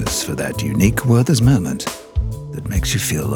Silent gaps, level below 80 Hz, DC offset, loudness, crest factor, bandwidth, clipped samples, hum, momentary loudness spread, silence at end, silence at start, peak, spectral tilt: none; -30 dBFS; under 0.1%; -18 LUFS; 14 dB; over 20 kHz; under 0.1%; none; 11 LU; 0 s; 0 s; -4 dBFS; -5 dB/octave